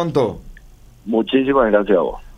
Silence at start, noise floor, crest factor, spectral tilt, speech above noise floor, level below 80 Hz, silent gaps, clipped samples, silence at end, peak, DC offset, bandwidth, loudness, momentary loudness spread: 0 s; -43 dBFS; 16 dB; -7.5 dB/octave; 27 dB; -40 dBFS; none; under 0.1%; 0.05 s; -2 dBFS; under 0.1%; 10.5 kHz; -17 LUFS; 14 LU